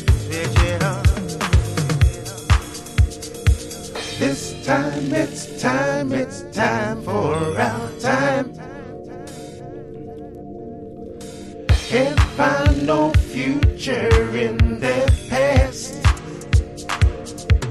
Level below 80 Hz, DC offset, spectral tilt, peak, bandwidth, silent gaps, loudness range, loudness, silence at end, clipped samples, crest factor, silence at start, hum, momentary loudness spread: -24 dBFS; under 0.1%; -5.5 dB/octave; -2 dBFS; 13.5 kHz; none; 7 LU; -20 LUFS; 0 s; under 0.1%; 18 dB; 0 s; none; 17 LU